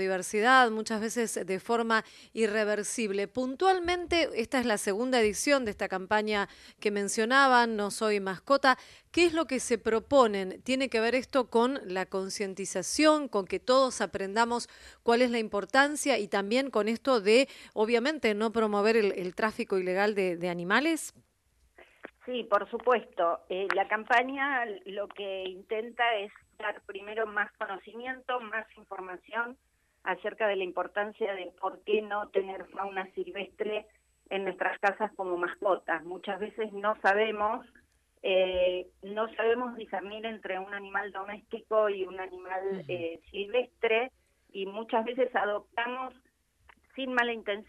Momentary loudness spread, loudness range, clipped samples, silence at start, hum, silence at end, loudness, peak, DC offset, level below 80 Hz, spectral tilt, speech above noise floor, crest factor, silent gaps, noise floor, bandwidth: 12 LU; 7 LU; under 0.1%; 0 s; none; 0.05 s; -29 LUFS; -8 dBFS; under 0.1%; -64 dBFS; -3.5 dB/octave; 40 dB; 22 dB; none; -69 dBFS; 13 kHz